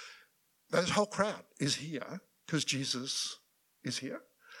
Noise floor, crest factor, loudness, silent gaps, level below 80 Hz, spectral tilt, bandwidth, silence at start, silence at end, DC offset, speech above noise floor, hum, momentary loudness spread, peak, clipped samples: -69 dBFS; 22 dB; -34 LUFS; none; -76 dBFS; -3.5 dB/octave; 18 kHz; 0 s; 0 s; under 0.1%; 34 dB; none; 17 LU; -14 dBFS; under 0.1%